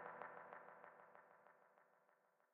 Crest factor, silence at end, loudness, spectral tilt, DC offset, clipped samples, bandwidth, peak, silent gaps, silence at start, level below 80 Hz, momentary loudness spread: 26 dB; 0 s; -60 LUFS; 2 dB/octave; under 0.1%; under 0.1%; 3.7 kHz; -34 dBFS; none; 0 s; under -90 dBFS; 12 LU